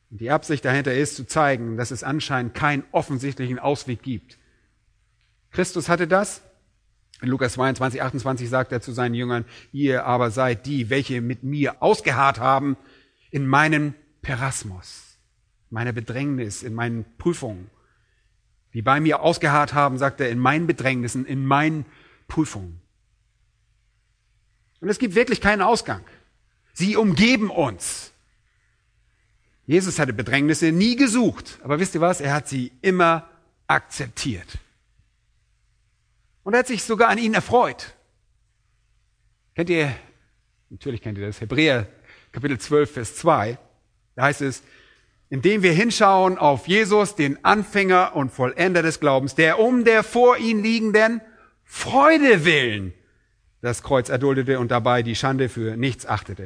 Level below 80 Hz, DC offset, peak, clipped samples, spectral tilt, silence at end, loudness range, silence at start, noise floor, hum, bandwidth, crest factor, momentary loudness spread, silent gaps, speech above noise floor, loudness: -52 dBFS; under 0.1%; 0 dBFS; under 0.1%; -5 dB/octave; 0 s; 9 LU; 0.1 s; -65 dBFS; none; 11 kHz; 22 dB; 14 LU; none; 45 dB; -21 LUFS